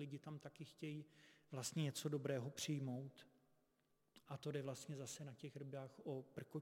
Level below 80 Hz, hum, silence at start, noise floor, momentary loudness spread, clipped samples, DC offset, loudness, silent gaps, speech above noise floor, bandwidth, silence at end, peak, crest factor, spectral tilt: -90 dBFS; none; 0 s; -83 dBFS; 12 LU; under 0.1%; under 0.1%; -49 LUFS; none; 34 dB; 16.5 kHz; 0 s; -30 dBFS; 20 dB; -5 dB/octave